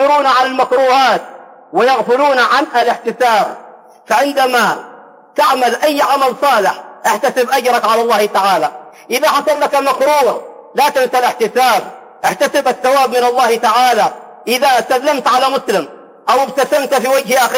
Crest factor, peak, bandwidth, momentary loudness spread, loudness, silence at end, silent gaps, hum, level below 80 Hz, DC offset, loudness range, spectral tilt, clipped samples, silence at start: 10 dB; -2 dBFS; 16.5 kHz; 7 LU; -13 LUFS; 0 s; none; none; -62 dBFS; under 0.1%; 1 LU; -2.5 dB/octave; under 0.1%; 0 s